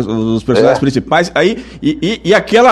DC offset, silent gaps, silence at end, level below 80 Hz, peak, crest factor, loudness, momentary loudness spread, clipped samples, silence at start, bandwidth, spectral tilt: under 0.1%; none; 0 s; -40 dBFS; 0 dBFS; 12 dB; -12 LUFS; 6 LU; under 0.1%; 0 s; 12.5 kHz; -5.5 dB/octave